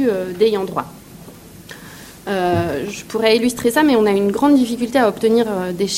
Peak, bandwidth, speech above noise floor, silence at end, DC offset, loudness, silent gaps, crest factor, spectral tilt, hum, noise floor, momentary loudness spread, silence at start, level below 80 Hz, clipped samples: -2 dBFS; 16.5 kHz; 22 dB; 0 s; under 0.1%; -17 LUFS; none; 16 dB; -5 dB/octave; none; -39 dBFS; 21 LU; 0 s; -50 dBFS; under 0.1%